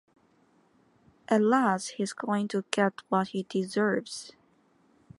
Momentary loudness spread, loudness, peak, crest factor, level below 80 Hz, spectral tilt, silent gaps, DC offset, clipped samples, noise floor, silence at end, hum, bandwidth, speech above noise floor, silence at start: 10 LU; -28 LUFS; -6 dBFS; 24 dB; -76 dBFS; -5 dB/octave; none; under 0.1%; under 0.1%; -65 dBFS; 0.9 s; none; 11.5 kHz; 37 dB; 1.3 s